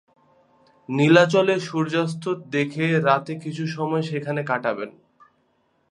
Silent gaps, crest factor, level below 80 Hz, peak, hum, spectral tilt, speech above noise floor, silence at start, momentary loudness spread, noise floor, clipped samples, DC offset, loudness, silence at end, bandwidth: none; 22 dB; -70 dBFS; -2 dBFS; none; -6.5 dB/octave; 45 dB; 0.9 s; 13 LU; -66 dBFS; under 0.1%; under 0.1%; -22 LUFS; 1 s; 11 kHz